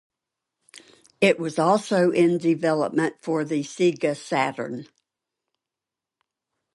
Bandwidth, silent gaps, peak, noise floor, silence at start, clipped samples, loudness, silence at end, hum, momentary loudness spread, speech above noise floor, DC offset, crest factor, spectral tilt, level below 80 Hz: 11.5 kHz; none; -6 dBFS; -88 dBFS; 0.75 s; under 0.1%; -23 LUFS; 1.9 s; none; 7 LU; 66 dB; under 0.1%; 18 dB; -5.5 dB/octave; -74 dBFS